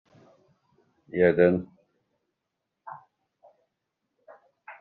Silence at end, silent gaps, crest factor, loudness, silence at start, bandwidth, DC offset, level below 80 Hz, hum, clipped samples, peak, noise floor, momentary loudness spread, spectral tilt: 0.1 s; none; 24 dB; -23 LUFS; 1.15 s; 4.3 kHz; under 0.1%; -68 dBFS; none; under 0.1%; -6 dBFS; -83 dBFS; 27 LU; -7 dB/octave